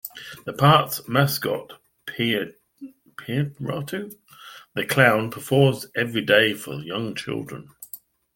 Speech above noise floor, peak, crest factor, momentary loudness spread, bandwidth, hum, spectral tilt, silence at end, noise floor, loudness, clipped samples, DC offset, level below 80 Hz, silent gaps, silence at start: 23 dB; -2 dBFS; 22 dB; 22 LU; 17 kHz; none; -5 dB/octave; 0.4 s; -45 dBFS; -22 LUFS; under 0.1%; under 0.1%; -62 dBFS; none; 0.05 s